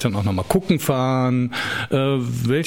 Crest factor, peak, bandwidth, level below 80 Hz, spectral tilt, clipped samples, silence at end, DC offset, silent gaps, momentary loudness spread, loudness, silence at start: 16 dB; -4 dBFS; 16.5 kHz; -46 dBFS; -6 dB/octave; under 0.1%; 0 s; 0.3%; none; 4 LU; -21 LUFS; 0 s